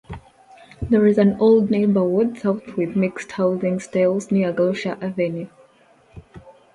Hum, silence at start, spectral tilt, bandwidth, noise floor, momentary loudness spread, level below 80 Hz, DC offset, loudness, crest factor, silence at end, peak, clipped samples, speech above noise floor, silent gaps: none; 0.1 s; -7.5 dB/octave; 11 kHz; -54 dBFS; 10 LU; -48 dBFS; under 0.1%; -20 LUFS; 16 dB; 0.25 s; -4 dBFS; under 0.1%; 35 dB; none